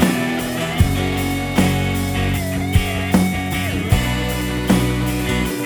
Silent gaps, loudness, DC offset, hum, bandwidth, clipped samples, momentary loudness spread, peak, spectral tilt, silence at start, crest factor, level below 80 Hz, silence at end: none; -19 LUFS; under 0.1%; none; over 20 kHz; under 0.1%; 4 LU; 0 dBFS; -5.5 dB/octave; 0 s; 18 dB; -28 dBFS; 0 s